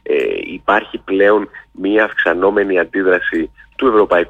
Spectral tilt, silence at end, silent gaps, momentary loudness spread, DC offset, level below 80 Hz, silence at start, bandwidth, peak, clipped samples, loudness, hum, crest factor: -6.5 dB/octave; 0 s; none; 8 LU; under 0.1%; -48 dBFS; 0.05 s; 7.2 kHz; -2 dBFS; under 0.1%; -15 LUFS; none; 12 dB